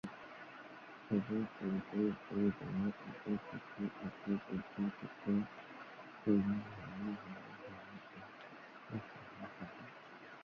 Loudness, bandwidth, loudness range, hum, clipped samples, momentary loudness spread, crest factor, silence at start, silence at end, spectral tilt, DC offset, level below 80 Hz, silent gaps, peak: -41 LUFS; 6.4 kHz; 9 LU; none; under 0.1%; 16 LU; 20 dB; 0.05 s; 0 s; -7 dB/octave; under 0.1%; -70 dBFS; none; -22 dBFS